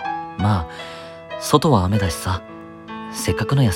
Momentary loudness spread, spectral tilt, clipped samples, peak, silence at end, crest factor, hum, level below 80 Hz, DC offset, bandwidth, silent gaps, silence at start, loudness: 18 LU; -5.5 dB/octave; under 0.1%; 0 dBFS; 0 s; 20 dB; none; -40 dBFS; under 0.1%; 17.5 kHz; none; 0 s; -21 LUFS